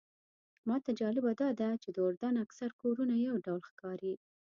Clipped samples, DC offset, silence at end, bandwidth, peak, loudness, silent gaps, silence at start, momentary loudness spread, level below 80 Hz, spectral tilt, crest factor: under 0.1%; under 0.1%; 0.45 s; 7 kHz; -22 dBFS; -36 LUFS; 2.17-2.21 s, 2.73-2.79 s, 3.70-3.77 s; 0.65 s; 9 LU; -82 dBFS; -7.5 dB/octave; 14 dB